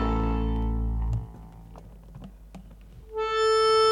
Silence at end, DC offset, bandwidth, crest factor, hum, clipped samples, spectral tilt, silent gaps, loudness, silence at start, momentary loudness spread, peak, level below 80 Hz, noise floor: 0 s; under 0.1%; 11 kHz; 14 dB; none; under 0.1%; -5.5 dB/octave; none; -26 LUFS; 0 s; 27 LU; -12 dBFS; -32 dBFS; -47 dBFS